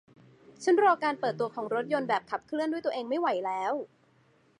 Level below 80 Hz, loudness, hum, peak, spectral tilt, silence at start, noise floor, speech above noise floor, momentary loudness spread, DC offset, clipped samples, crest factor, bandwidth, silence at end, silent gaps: -80 dBFS; -29 LUFS; none; -12 dBFS; -5 dB/octave; 0.6 s; -65 dBFS; 36 dB; 10 LU; under 0.1%; under 0.1%; 18 dB; 11.5 kHz; 0.75 s; none